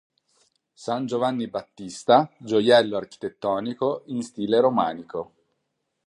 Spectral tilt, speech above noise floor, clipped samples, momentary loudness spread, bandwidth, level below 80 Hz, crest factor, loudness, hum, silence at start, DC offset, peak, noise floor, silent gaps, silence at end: -5.5 dB/octave; 54 dB; under 0.1%; 16 LU; 11 kHz; -68 dBFS; 20 dB; -23 LUFS; none; 0.8 s; under 0.1%; -4 dBFS; -77 dBFS; none; 0.8 s